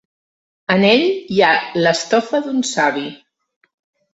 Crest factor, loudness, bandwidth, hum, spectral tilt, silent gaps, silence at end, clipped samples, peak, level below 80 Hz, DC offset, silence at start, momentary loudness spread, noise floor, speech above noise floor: 18 dB; -16 LUFS; 8.2 kHz; none; -4 dB/octave; none; 1 s; under 0.1%; 0 dBFS; -60 dBFS; under 0.1%; 0.7 s; 9 LU; under -90 dBFS; over 74 dB